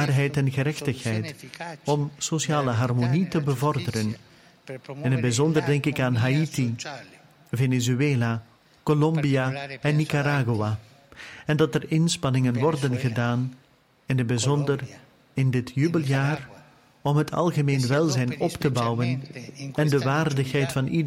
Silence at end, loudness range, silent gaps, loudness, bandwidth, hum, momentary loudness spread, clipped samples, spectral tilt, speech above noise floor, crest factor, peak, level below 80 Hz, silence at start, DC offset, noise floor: 0 s; 2 LU; none; -25 LUFS; 16 kHz; none; 11 LU; under 0.1%; -6 dB/octave; 29 dB; 14 dB; -10 dBFS; -58 dBFS; 0 s; under 0.1%; -53 dBFS